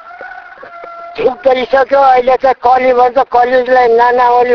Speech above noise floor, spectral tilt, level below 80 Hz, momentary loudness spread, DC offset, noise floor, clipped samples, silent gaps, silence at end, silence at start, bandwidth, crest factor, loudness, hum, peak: 22 dB; -5 dB/octave; -46 dBFS; 21 LU; under 0.1%; -31 dBFS; 0.2%; none; 0 s; 0.05 s; 5.4 kHz; 10 dB; -9 LUFS; none; 0 dBFS